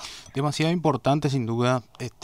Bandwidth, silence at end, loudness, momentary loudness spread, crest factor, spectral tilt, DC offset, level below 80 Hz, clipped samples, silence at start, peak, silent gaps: 15 kHz; 0.15 s; -25 LUFS; 7 LU; 16 dB; -6 dB/octave; 0.1%; -56 dBFS; under 0.1%; 0 s; -10 dBFS; none